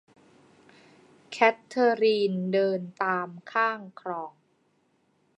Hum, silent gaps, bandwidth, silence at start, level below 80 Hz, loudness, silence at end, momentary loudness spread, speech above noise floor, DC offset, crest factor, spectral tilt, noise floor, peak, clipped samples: none; none; 9.6 kHz; 1.3 s; -82 dBFS; -26 LUFS; 1.1 s; 13 LU; 43 dB; under 0.1%; 24 dB; -6 dB/octave; -69 dBFS; -6 dBFS; under 0.1%